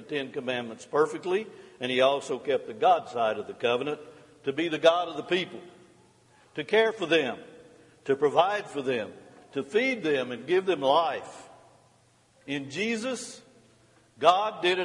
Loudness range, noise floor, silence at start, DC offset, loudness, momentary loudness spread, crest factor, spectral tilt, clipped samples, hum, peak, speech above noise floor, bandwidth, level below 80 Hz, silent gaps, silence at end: 3 LU; -63 dBFS; 0 s; under 0.1%; -27 LUFS; 14 LU; 22 dB; -4 dB/octave; under 0.1%; none; -6 dBFS; 36 dB; 11.5 kHz; -76 dBFS; none; 0 s